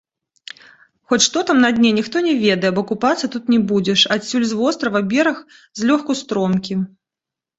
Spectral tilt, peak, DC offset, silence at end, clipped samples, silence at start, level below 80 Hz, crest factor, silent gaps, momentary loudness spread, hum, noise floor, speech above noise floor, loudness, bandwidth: -4 dB/octave; -2 dBFS; under 0.1%; 0.7 s; under 0.1%; 1.1 s; -58 dBFS; 18 dB; none; 10 LU; none; -87 dBFS; 70 dB; -17 LUFS; 8 kHz